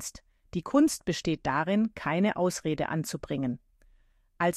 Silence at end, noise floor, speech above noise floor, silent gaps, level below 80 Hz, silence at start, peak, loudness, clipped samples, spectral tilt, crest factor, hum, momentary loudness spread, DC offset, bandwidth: 0 s; -63 dBFS; 35 dB; none; -56 dBFS; 0 s; -10 dBFS; -29 LUFS; under 0.1%; -5.5 dB/octave; 18 dB; none; 11 LU; under 0.1%; 15 kHz